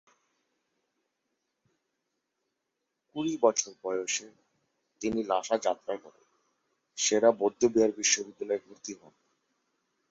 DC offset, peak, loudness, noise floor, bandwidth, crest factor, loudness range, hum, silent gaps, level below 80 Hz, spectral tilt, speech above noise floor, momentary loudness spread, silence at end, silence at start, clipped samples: under 0.1%; -10 dBFS; -28 LUFS; -83 dBFS; 8 kHz; 22 dB; 6 LU; none; none; -72 dBFS; -2 dB/octave; 55 dB; 18 LU; 1.15 s; 3.15 s; under 0.1%